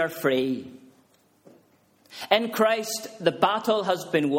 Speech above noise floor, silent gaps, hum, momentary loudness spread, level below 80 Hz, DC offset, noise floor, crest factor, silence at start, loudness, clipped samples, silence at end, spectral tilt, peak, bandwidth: 37 dB; none; none; 13 LU; -72 dBFS; under 0.1%; -62 dBFS; 22 dB; 0 s; -25 LUFS; under 0.1%; 0 s; -4 dB/octave; -4 dBFS; 16.5 kHz